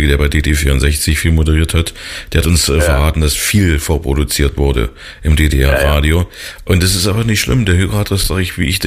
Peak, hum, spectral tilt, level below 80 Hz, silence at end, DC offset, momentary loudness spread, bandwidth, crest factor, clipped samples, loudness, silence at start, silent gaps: 0 dBFS; none; -4.5 dB/octave; -18 dBFS; 0 s; 0.1%; 5 LU; 15.5 kHz; 12 dB; under 0.1%; -13 LUFS; 0 s; none